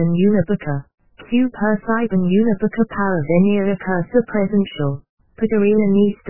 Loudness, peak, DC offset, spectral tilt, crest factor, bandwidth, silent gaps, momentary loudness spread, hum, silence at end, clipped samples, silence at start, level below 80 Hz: -18 LUFS; -2 dBFS; 2%; -12 dB/octave; 14 dB; 3.1 kHz; 5.09-5.18 s; 8 LU; none; 0 s; under 0.1%; 0 s; -46 dBFS